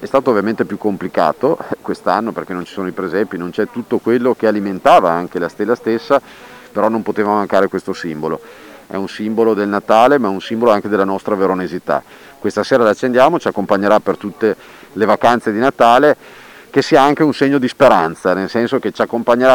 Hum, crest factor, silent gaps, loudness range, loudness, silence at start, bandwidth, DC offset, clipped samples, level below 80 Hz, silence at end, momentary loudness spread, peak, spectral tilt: none; 14 dB; none; 5 LU; -15 LUFS; 0 s; 19 kHz; under 0.1%; under 0.1%; -54 dBFS; 0 s; 11 LU; 0 dBFS; -6 dB/octave